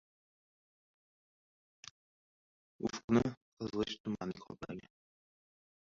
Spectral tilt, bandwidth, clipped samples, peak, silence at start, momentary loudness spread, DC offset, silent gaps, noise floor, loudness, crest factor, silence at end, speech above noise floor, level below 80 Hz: -5.5 dB/octave; 7.4 kHz; under 0.1%; -16 dBFS; 2.8 s; 22 LU; under 0.1%; 3.04-3.08 s, 3.37-3.57 s, 4.00-4.04 s; under -90 dBFS; -38 LUFS; 26 dB; 1.15 s; over 53 dB; -66 dBFS